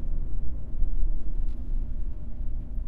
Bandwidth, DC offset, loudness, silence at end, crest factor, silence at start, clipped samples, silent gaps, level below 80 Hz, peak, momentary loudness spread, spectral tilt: 1.1 kHz; under 0.1%; -36 LUFS; 0 s; 12 dB; 0 s; under 0.1%; none; -28 dBFS; -10 dBFS; 4 LU; -10.5 dB/octave